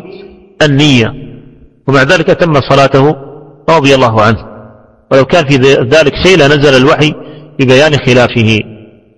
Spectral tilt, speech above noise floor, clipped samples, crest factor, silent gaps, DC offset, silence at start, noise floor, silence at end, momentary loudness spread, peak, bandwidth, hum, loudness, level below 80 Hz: -5.5 dB/octave; 30 dB; 2%; 8 dB; none; under 0.1%; 0.05 s; -37 dBFS; 0.4 s; 11 LU; 0 dBFS; 11 kHz; none; -7 LUFS; -34 dBFS